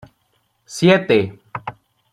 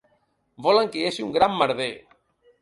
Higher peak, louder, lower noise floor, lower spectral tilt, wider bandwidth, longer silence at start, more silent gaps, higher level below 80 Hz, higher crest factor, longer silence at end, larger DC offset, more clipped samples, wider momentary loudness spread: first, -2 dBFS vs -6 dBFS; first, -16 LUFS vs -23 LUFS; about the same, -65 dBFS vs -68 dBFS; about the same, -5.5 dB/octave vs -4.5 dB/octave; first, 13 kHz vs 11.5 kHz; about the same, 0.7 s vs 0.6 s; neither; about the same, -58 dBFS vs -62 dBFS; about the same, 18 dB vs 20 dB; second, 0.4 s vs 0.65 s; neither; neither; first, 19 LU vs 9 LU